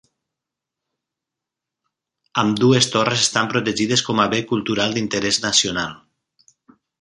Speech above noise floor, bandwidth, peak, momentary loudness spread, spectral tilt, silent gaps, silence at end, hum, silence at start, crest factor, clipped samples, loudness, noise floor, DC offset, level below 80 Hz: 66 dB; 11.5 kHz; -2 dBFS; 6 LU; -3.5 dB/octave; none; 1.05 s; none; 2.35 s; 20 dB; under 0.1%; -18 LUFS; -85 dBFS; under 0.1%; -56 dBFS